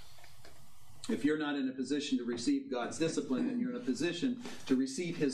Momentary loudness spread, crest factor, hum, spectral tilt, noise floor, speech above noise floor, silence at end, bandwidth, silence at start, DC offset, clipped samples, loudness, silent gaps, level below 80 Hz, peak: 4 LU; 16 dB; none; -4.5 dB/octave; -60 dBFS; 26 dB; 0 s; 12.5 kHz; 0 s; 0.2%; under 0.1%; -35 LUFS; none; -72 dBFS; -18 dBFS